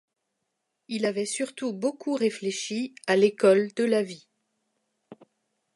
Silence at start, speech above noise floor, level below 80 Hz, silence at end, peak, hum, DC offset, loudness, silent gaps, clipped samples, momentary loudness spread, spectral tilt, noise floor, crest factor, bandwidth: 0.9 s; 55 dB; -82 dBFS; 0.6 s; -8 dBFS; none; under 0.1%; -26 LUFS; none; under 0.1%; 11 LU; -4.5 dB/octave; -80 dBFS; 20 dB; 11.5 kHz